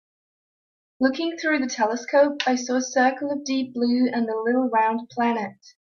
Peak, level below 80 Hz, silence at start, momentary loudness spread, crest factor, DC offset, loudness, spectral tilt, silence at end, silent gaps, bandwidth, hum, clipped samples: -6 dBFS; -72 dBFS; 1 s; 5 LU; 16 dB; under 0.1%; -23 LUFS; -3.5 dB/octave; 0.4 s; none; 7.2 kHz; none; under 0.1%